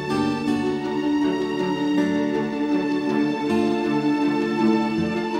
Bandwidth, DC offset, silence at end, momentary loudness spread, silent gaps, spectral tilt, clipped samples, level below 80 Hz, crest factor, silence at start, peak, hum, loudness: 10.5 kHz; under 0.1%; 0 s; 3 LU; none; -6.5 dB/octave; under 0.1%; -56 dBFS; 14 dB; 0 s; -8 dBFS; none; -22 LUFS